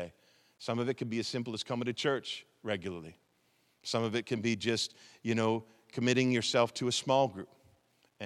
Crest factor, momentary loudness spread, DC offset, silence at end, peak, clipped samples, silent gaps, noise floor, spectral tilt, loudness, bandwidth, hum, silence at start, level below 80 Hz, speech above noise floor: 22 dB; 16 LU; under 0.1%; 0 s; -12 dBFS; under 0.1%; none; -72 dBFS; -4.5 dB/octave; -33 LUFS; 13 kHz; none; 0 s; -78 dBFS; 40 dB